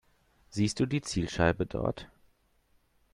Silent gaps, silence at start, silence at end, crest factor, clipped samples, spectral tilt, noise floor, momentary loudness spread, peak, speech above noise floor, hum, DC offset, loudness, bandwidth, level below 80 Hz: none; 0.5 s; 1.1 s; 22 dB; under 0.1%; -5.5 dB/octave; -69 dBFS; 9 LU; -10 dBFS; 39 dB; none; under 0.1%; -31 LUFS; 12 kHz; -52 dBFS